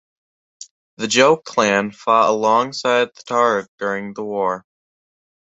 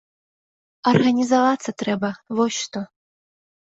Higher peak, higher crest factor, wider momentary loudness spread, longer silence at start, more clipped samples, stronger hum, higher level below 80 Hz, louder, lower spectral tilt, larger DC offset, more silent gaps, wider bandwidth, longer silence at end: about the same, -2 dBFS vs -4 dBFS; about the same, 18 dB vs 20 dB; about the same, 10 LU vs 11 LU; second, 0.6 s vs 0.85 s; neither; neither; about the same, -64 dBFS vs -62 dBFS; first, -18 LUFS vs -21 LUFS; second, -3 dB/octave vs -5 dB/octave; neither; first, 0.71-0.97 s, 3.68-3.78 s vs none; about the same, 8.4 kHz vs 8 kHz; about the same, 0.9 s vs 0.85 s